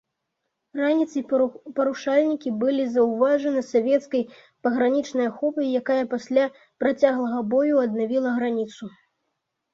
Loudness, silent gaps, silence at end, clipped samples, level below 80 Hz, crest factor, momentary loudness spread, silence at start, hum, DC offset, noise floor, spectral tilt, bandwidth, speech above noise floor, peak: -23 LUFS; none; 0.85 s; under 0.1%; -70 dBFS; 18 dB; 7 LU; 0.75 s; none; under 0.1%; -79 dBFS; -6 dB/octave; 7.6 kHz; 57 dB; -6 dBFS